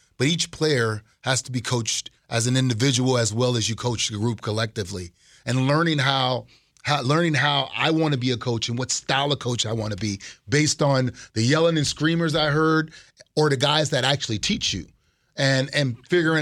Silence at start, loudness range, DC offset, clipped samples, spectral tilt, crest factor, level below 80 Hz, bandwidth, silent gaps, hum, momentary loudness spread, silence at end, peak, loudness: 0.2 s; 2 LU; under 0.1%; under 0.1%; -4 dB/octave; 18 dB; -54 dBFS; 13.5 kHz; none; none; 8 LU; 0 s; -4 dBFS; -22 LUFS